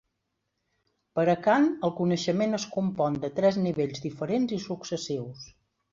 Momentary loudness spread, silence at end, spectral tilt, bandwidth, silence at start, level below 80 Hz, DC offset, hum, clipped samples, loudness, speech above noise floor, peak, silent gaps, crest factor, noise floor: 11 LU; 0.45 s; -6 dB/octave; 7.6 kHz; 1.15 s; -66 dBFS; under 0.1%; none; under 0.1%; -27 LUFS; 53 dB; -10 dBFS; none; 18 dB; -80 dBFS